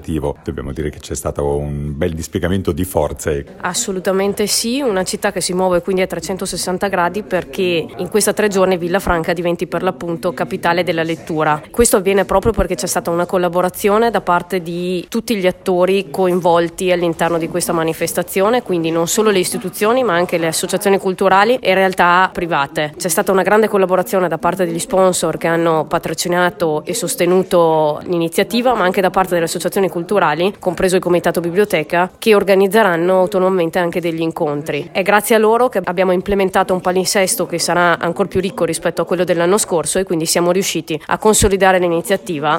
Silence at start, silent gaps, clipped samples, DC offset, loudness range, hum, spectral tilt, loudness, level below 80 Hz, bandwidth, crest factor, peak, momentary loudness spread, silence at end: 0 s; none; under 0.1%; under 0.1%; 3 LU; none; -4 dB/octave; -16 LUFS; -38 dBFS; 16.5 kHz; 16 dB; 0 dBFS; 8 LU; 0 s